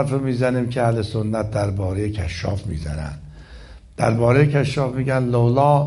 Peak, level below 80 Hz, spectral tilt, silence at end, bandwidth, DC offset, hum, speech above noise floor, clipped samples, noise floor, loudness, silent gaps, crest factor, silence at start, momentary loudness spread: -4 dBFS; -38 dBFS; -7.5 dB/octave; 0 s; 11.5 kHz; under 0.1%; none; 21 dB; under 0.1%; -41 dBFS; -20 LUFS; none; 16 dB; 0 s; 12 LU